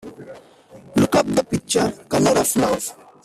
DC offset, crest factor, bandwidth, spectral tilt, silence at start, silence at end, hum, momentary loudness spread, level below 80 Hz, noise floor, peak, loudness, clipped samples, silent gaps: under 0.1%; 16 dB; 16 kHz; -4.5 dB/octave; 0.05 s; 0.3 s; none; 12 LU; -50 dBFS; -46 dBFS; -4 dBFS; -19 LUFS; under 0.1%; none